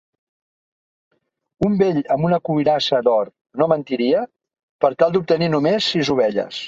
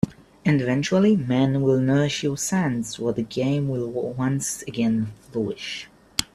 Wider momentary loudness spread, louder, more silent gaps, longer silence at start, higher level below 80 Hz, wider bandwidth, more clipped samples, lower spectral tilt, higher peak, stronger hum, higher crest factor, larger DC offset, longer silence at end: second, 5 LU vs 9 LU; first, -19 LUFS vs -23 LUFS; first, 3.41-3.45 s, 4.63-4.79 s vs none; first, 1.6 s vs 0.05 s; about the same, -54 dBFS vs -54 dBFS; second, 7.8 kHz vs 14.5 kHz; neither; about the same, -6.5 dB/octave vs -5.5 dB/octave; about the same, -2 dBFS vs 0 dBFS; neither; about the same, 18 dB vs 22 dB; neither; about the same, 0 s vs 0.1 s